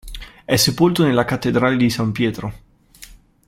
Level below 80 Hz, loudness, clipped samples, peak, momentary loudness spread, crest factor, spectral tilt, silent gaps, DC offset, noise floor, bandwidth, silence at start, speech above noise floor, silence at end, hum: -42 dBFS; -17 LUFS; under 0.1%; -2 dBFS; 16 LU; 18 dB; -5 dB/octave; none; under 0.1%; -44 dBFS; 16.5 kHz; 0.05 s; 27 dB; 0.4 s; none